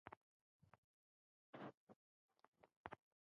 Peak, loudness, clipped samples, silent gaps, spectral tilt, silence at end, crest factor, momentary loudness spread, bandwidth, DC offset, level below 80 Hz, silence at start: -32 dBFS; -61 LUFS; under 0.1%; 0.17-0.60 s, 0.78-1.53 s, 1.74-1.87 s, 1.96-2.29 s, 2.48-2.53 s, 2.76-2.84 s; -4.5 dB/octave; 0.3 s; 32 dB; 6 LU; 6 kHz; under 0.1%; -88 dBFS; 0.05 s